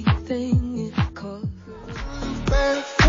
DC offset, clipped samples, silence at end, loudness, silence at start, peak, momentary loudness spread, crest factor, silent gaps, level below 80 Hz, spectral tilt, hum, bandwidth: under 0.1%; under 0.1%; 0 s; -25 LUFS; 0 s; -4 dBFS; 12 LU; 20 dB; none; -30 dBFS; -5 dB/octave; none; 7.4 kHz